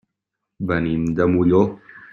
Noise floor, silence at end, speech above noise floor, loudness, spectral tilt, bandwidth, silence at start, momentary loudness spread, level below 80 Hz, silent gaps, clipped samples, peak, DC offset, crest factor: -81 dBFS; 0.05 s; 62 dB; -19 LUFS; -9 dB/octave; 7.2 kHz; 0.6 s; 12 LU; -48 dBFS; none; under 0.1%; -2 dBFS; under 0.1%; 18 dB